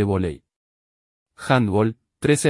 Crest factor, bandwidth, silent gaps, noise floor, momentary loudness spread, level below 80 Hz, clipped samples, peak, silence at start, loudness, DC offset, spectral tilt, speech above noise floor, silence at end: 18 dB; 12 kHz; 0.56-1.26 s; under -90 dBFS; 15 LU; -52 dBFS; under 0.1%; -4 dBFS; 0 s; -22 LUFS; under 0.1%; -6 dB/octave; over 70 dB; 0 s